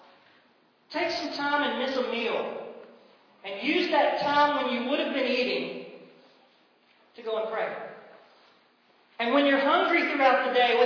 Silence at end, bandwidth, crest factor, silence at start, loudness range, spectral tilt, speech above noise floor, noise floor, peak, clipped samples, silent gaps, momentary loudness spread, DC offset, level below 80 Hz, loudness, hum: 0 s; 5.4 kHz; 18 dB; 0.9 s; 10 LU; -4 dB/octave; 38 dB; -63 dBFS; -10 dBFS; under 0.1%; none; 17 LU; under 0.1%; -74 dBFS; -26 LUFS; none